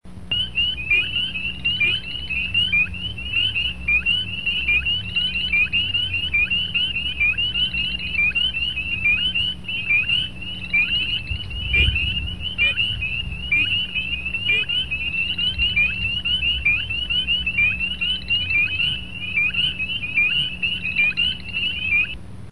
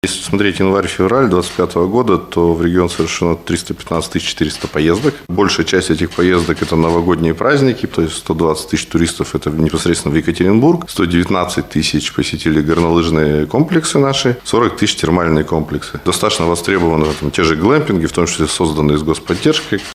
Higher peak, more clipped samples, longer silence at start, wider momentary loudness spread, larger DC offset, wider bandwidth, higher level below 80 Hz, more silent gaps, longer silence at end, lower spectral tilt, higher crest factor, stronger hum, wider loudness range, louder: second, -6 dBFS vs 0 dBFS; neither; about the same, 0 s vs 0.05 s; about the same, 6 LU vs 5 LU; first, 1% vs under 0.1%; second, 12 kHz vs 15.5 kHz; about the same, -36 dBFS vs -34 dBFS; neither; about the same, 0 s vs 0 s; second, -3.5 dB/octave vs -5 dB/octave; about the same, 16 dB vs 14 dB; neither; about the same, 1 LU vs 2 LU; second, -19 LUFS vs -14 LUFS